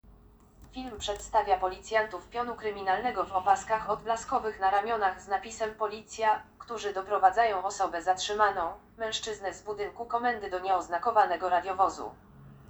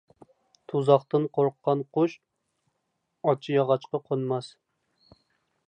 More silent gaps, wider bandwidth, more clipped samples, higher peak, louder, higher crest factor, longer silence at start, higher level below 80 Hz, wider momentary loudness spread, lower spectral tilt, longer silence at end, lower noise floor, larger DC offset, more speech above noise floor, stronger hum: neither; first, over 20 kHz vs 9.2 kHz; neither; second, -10 dBFS vs -6 dBFS; second, -30 LUFS vs -26 LUFS; about the same, 20 dB vs 22 dB; second, 0.6 s vs 0.75 s; first, -58 dBFS vs -78 dBFS; about the same, 11 LU vs 9 LU; second, -2.5 dB/octave vs -8 dB/octave; second, 0.05 s vs 1.2 s; second, -57 dBFS vs -78 dBFS; neither; second, 27 dB vs 53 dB; neither